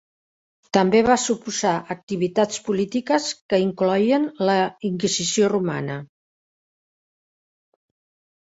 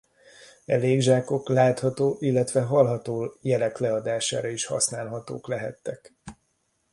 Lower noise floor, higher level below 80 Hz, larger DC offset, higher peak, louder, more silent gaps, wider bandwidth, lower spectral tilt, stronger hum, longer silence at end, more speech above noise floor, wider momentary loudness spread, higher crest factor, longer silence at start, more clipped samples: first, under -90 dBFS vs -72 dBFS; about the same, -60 dBFS vs -64 dBFS; neither; first, -2 dBFS vs -6 dBFS; first, -21 LUFS vs -25 LUFS; first, 2.03-2.07 s, 3.41-3.49 s vs none; second, 8 kHz vs 11.5 kHz; about the same, -4.5 dB/octave vs -5 dB/octave; neither; first, 2.4 s vs 0.6 s; first, over 69 dB vs 47 dB; second, 8 LU vs 13 LU; about the same, 20 dB vs 20 dB; first, 0.75 s vs 0.4 s; neither